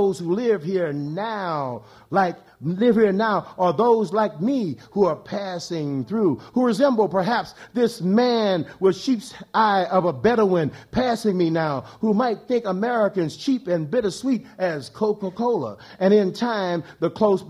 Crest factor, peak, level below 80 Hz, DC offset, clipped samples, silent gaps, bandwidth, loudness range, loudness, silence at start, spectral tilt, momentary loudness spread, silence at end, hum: 16 dB; -6 dBFS; -58 dBFS; under 0.1%; under 0.1%; none; 13 kHz; 2 LU; -22 LUFS; 0 s; -6.5 dB/octave; 8 LU; 0 s; none